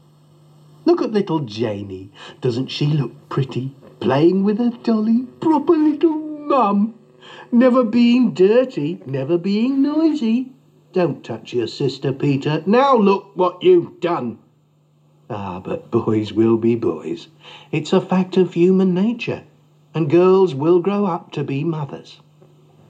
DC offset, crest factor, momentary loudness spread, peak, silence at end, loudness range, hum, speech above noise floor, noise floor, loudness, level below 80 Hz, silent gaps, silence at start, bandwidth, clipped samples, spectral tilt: under 0.1%; 14 dB; 14 LU; -4 dBFS; 0.75 s; 5 LU; none; 39 dB; -57 dBFS; -18 LUFS; -70 dBFS; none; 0.85 s; 7.8 kHz; under 0.1%; -8 dB/octave